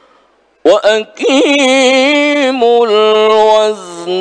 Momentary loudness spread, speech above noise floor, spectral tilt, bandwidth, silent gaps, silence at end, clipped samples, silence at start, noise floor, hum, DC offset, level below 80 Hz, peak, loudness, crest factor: 6 LU; 42 dB; -2.5 dB/octave; 10 kHz; none; 0 s; under 0.1%; 0.65 s; -51 dBFS; none; under 0.1%; -58 dBFS; 0 dBFS; -9 LUFS; 10 dB